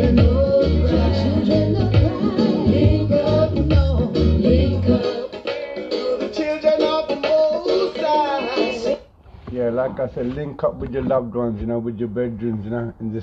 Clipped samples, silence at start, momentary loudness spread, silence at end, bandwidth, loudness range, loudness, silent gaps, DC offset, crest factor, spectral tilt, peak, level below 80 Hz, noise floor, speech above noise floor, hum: under 0.1%; 0 s; 9 LU; 0 s; 7.6 kHz; 6 LU; -20 LUFS; none; under 0.1%; 16 dB; -8.5 dB/octave; -4 dBFS; -28 dBFS; -43 dBFS; 20 dB; none